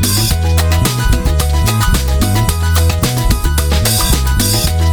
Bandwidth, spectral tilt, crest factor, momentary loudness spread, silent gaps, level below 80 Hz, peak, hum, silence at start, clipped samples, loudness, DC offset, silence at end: over 20 kHz; -4 dB/octave; 10 dB; 2 LU; none; -16 dBFS; -2 dBFS; none; 0 s; under 0.1%; -13 LUFS; under 0.1%; 0 s